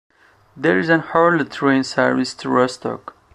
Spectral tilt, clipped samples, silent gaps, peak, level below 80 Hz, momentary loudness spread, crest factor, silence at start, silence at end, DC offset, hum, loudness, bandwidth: -5.5 dB/octave; under 0.1%; none; -2 dBFS; -60 dBFS; 9 LU; 18 dB; 0.55 s; 0.25 s; under 0.1%; none; -18 LUFS; 11 kHz